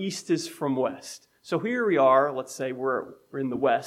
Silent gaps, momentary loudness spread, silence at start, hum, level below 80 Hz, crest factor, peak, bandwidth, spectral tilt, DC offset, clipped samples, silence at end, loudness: none; 16 LU; 0 s; none; -74 dBFS; 18 dB; -8 dBFS; 15.5 kHz; -5 dB/octave; under 0.1%; under 0.1%; 0 s; -26 LUFS